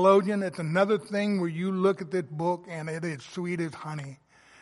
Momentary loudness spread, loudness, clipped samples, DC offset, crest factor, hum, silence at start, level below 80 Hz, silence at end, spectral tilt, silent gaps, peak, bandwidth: 10 LU; -28 LUFS; under 0.1%; under 0.1%; 20 dB; none; 0 s; -74 dBFS; 0.45 s; -7 dB/octave; none; -8 dBFS; 11.5 kHz